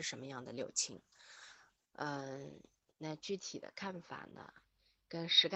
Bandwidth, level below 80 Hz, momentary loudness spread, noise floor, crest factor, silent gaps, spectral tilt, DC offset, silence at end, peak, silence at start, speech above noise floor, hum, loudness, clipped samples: 9.2 kHz; -82 dBFS; 20 LU; -65 dBFS; 26 dB; none; -2 dB/octave; under 0.1%; 0 s; -16 dBFS; 0 s; 24 dB; none; -40 LUFS; under 0.1%